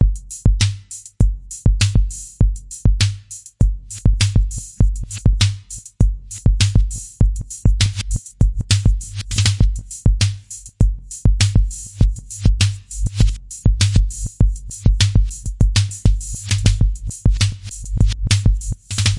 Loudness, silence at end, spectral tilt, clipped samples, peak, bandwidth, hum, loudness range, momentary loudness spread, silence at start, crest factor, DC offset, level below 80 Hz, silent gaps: -19 LUFS; 0 s; -4.5 dB/octave; under 0.1%; 0 dBFS; 11.5 kHz; none; 1 LU; 8 LU; 0 s; 16 dB; under 0.1%; -20 dBFS; none